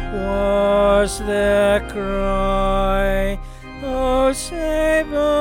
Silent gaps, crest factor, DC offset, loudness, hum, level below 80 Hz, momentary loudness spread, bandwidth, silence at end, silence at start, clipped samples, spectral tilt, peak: none; 12 dB; under 0.1%; -19 LUFS; none; -28 dBFS; 9 LU; 17 kHz; 0 s; 0 s; under 0.1%; -5 dB/octave; -6 dBFS